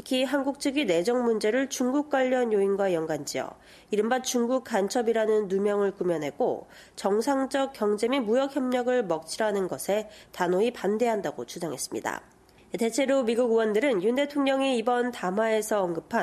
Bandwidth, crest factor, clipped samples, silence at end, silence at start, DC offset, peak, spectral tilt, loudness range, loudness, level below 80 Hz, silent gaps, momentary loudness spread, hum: 14 kHz; 16 dB; under 0.1%; 0 s; 0.05 s; under 0.1%; -10 dBFS; -4.5 dB/octave; 3 LU; -27 LUFS; -68 dBFS; none; 7 LU; none